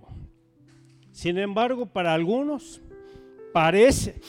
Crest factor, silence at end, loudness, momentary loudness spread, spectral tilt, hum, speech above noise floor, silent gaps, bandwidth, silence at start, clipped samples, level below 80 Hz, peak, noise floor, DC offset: 18 dB; 0 s; -23 LUFS; 13 LU; -5 dB/octave; none; 34 dB; none; 17 kHz; 0.1 s; under 0.1%; -46 dBFS; -6 dBFS; -56 dBFS; under 0.1%